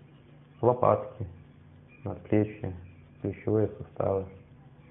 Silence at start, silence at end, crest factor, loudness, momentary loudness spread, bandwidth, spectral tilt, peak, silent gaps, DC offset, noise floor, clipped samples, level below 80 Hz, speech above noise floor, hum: 0.6 s; 0.35 s; 22 dB; -30 LUFS; 17 LU; 3.7 kHz; -12.5 dB/octave; -8 dBFS; none; under 0.1%; -54 dBFS; under 0.1%; -62 dBFS; 26 dB; none